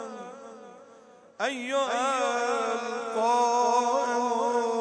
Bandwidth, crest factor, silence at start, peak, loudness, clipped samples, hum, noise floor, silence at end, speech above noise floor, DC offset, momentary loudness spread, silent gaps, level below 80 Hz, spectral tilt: 10.5 kHz; 14 dB; 0 s; -14 dBFS; -26 LUFS; under 0.1%; none; -53 dBFS; 0 s; 26 dB; under 0.1%; 18 LU; none; under -90 dBFS; -2 dB/octave